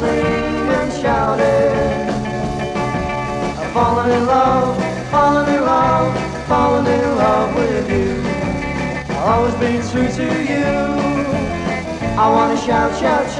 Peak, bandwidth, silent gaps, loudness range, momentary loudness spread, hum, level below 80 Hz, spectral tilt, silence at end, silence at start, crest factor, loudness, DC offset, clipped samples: -2 dBFS; 11 kHz; none; 3 LU; 7 LU; none; -34 dBFS; -6 dB/octave; 0 s; 0 s; 14 dB; -17 LUFS; under 0.1%; under 0.1%